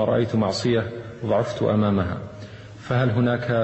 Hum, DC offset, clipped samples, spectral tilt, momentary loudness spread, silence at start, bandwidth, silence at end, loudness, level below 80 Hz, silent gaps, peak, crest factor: none; under 0.1%; under 0.1%; -7 dB/octave; 16 LU; 0 s; 8.4 kHz; 0 s; -23 LUFS; -50 dBFS; none; -8 dBFS; 14 dB